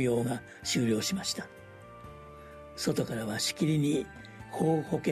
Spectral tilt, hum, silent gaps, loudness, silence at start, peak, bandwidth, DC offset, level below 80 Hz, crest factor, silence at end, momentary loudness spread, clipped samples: -5 dB/octave; none; none; -31 LUFS; 0 s; -14 dBFS; 13.5 kHz; under 0.1%; -60 dBFS; 18 dB; 0 s; 20 LU; under 0.1%